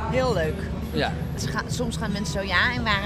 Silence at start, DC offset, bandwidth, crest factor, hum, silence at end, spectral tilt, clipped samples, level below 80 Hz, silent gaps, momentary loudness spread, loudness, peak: 0 s; under 0.1%; 15.5 kHz; 20 dB; none; 0 s; -5 dB/octave; under 0.1%; -36 dBFS; none; 7 LU; -25 LUFS; -6 dBFS